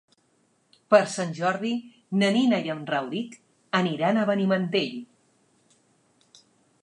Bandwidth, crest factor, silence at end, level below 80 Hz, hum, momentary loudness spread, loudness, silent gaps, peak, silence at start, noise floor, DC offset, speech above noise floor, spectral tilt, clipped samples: 11 kHz; 22 dB; 1.8 s; -80 dBFS; none; 12 LU; -25 LUFS; none; -4 dBFS; 0.9 s; -67 dBFS; under 0.1%; 43 dB; -5.5 dB/octave; under 0.1%